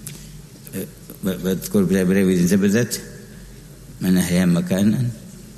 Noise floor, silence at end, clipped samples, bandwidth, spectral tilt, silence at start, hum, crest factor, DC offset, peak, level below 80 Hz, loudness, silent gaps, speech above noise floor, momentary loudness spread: -40 dBFS; 0 s; under 0.1%; 13.5 kHz; -6 dB/octave; 0 s; none; 16 dB; under 0.1%; -6 dBFS; -46 dBFS; -19 LUFS; none; 21 dB; 22 LU